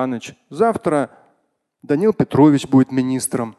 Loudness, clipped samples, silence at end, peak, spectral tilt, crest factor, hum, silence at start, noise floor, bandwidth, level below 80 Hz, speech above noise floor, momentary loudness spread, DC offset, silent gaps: -17 LUFS; under 0.1%; 0.1 s; 0 dBFS; -6.5 dB/octave; 18 dB; none; 0 s; -68 dBFS; 12.5 kHz; -54 dBFS; 51 dB; 13 LU; under 0.1%; none